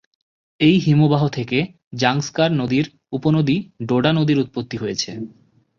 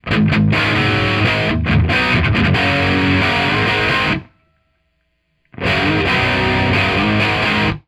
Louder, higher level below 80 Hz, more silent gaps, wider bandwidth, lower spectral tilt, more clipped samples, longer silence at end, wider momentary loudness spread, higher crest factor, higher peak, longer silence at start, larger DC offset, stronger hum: second, -19 LUFS vs -15 LUFS; second, -54 dBFS vs -32 dBFS; first, 1.84-1.91 s vs none; second, 7.2 kHz vs 12 kHz; about the same, -6 dB/octave vs -6 dB/octave; neither; first, 0.5 s vs 0.1 s; first, 11 LU vs 2 LU; about the same, 16 dB vs 12 dB; about the same, -2 dBFS vs -4 dBFS; first, 0.6 s vs 0.05 s; neither; neither